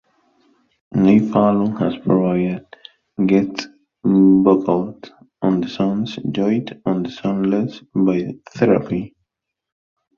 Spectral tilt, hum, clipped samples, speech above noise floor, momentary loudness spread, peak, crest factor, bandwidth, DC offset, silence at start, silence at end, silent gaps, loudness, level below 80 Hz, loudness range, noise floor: -8.5 dB/octave; none; under 0.1%; 61 dB; 12 LU; -2 dBFS; 16 dB; 7 kHz; under 0.1%; 0.95 s; 1.1 s; none; -18 LUFS; -54 dBFS; 3 LU; -78 dBFS